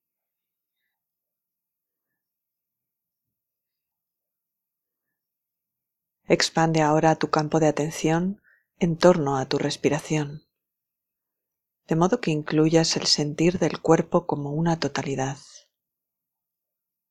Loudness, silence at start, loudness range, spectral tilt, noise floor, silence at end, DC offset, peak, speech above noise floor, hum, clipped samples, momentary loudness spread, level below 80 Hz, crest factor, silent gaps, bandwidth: -23 LUFS; 6.3 s; 5 LU; -5 dB/octave; -84 dBFS; 1.75 s; under 0.1%; -2 dBFS; 62 dB; none; under 0.1%; 9 LU; -58 dBFS; 24 dB; none; 13 kHz